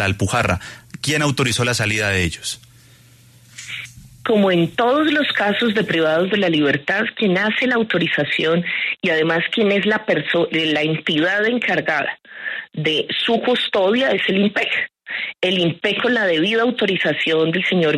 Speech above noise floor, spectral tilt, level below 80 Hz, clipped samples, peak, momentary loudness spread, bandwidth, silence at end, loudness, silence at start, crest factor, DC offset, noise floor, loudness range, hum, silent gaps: 30 dB; -4.5 dB/octave; -50 dBFS; under 0.1%; -6 dBFS; 9 LU; 13.5 kHz; 0 s; -18 LUFS; 0 s; 14 dB; under 0.1%; -48 dBFS; 4 LU; none; none